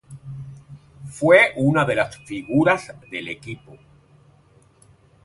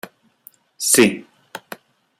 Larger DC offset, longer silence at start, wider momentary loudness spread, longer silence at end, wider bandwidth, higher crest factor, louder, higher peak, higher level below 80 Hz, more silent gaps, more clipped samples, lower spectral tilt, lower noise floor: neither; second, 0.1 s vs 0.8 s; about the same, 25 LU vs 25 LU; first, 1.7 s vs 0.6 s; second, 11.5 kHz vs 16 kHz; about the same, 22 dB vs 22 dB; second, -19 LUFS vs -16 LUFS; about the same, 0 dBFS vs 0 dBFS; first, -56 dBFS vs -64 dBFS; neither; neither; first, -6 dB/octave vs -2.5 dB/octave; first, -55 dBFS vs -51 dBFS